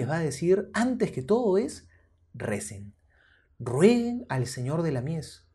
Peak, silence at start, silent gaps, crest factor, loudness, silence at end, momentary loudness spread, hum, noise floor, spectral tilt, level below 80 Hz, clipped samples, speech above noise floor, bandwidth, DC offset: -8 dBFS; 0 s; none; 20 dB; -27 LUFS; 0.2 s; 15 LU; none; -63 dBFS; -6.5 dB/octave; -60 dBFS; under 0.1%; 36 dB; 12 kHz; under 0.1%